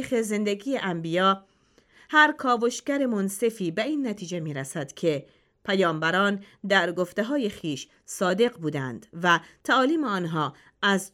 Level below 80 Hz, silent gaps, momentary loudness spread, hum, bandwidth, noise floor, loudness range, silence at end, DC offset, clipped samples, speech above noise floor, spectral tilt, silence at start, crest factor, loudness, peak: -68 dBFS; none; 10 LU; none; 16 kHz; -60 dBFS; 3 LU; 0.05 s; under 0.1%; under 0.1%; 34 dB; -4.5 dB/octave; 0 s; 20 dB; -25 LUFS; -6 dBFS